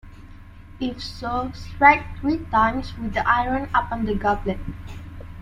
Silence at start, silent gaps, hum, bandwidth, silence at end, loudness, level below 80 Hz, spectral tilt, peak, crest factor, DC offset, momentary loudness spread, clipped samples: 0.05 s; none; none; 13.5 kHz; 0 s; -22 LUFS; -38 dBFS; -6.5 dB/octave; -2 dBFS; 22 dB; under 0.1%; 18 LU; under 0.1%